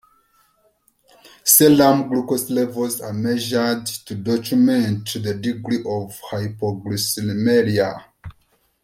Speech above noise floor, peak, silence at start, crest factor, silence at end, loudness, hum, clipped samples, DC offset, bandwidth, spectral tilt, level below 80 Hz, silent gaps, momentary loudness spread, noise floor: 43 dB; 0 dBFS; 1.45 s; 20 dB; 0.5 s; -19 LUFS; none; under 0.1%; under 0.1%; 16.5 kHz; -4.5 dB/octave; -58 dBFS; none; 14 LU; -62 dBFS